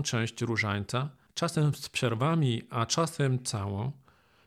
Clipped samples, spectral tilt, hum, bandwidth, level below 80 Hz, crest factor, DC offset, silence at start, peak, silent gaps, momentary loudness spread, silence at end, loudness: under 0.1%; -5 dB/octave; none; 15 kHz; -64 dBFS; 16 dB; under 0.1%; 0 s; -14 dBFS; none; 7 LU; 0.5 s; -30 LUFS